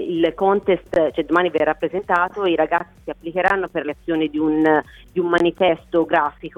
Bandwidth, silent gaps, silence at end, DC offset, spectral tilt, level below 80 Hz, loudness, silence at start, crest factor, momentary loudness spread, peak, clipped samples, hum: 9.6 kHz; none; 0.1 s; under 0.1%; -7 dB/octave; -50 dBFS; -19 LUFS; 0 s; 18 dB; 7 LU; -2 dBFS; under 0.1%; none